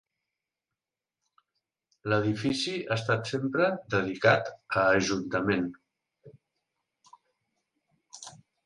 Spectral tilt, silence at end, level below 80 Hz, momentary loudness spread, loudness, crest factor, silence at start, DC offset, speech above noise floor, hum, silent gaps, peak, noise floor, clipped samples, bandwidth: -5 dB/octave; 0.35 s; -62 dBFS; 15 LU; -28 LUFS; 22 dB; 2.05 s; under 0.1%; 62 dB; none; none; -8 dBFS; -90 dBFS; under 0.1%; 11.5 kHz